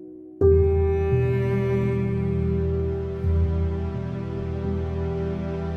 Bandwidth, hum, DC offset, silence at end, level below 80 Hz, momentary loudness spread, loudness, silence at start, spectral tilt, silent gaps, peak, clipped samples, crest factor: 4.7 kHz; none; under 0.1%; 0 s; -32 dBFS; 9 LU; -24 LUFS; 0 s; -10.5 dB/octave; none; -8 dBFS; under 0.1%; 16 dB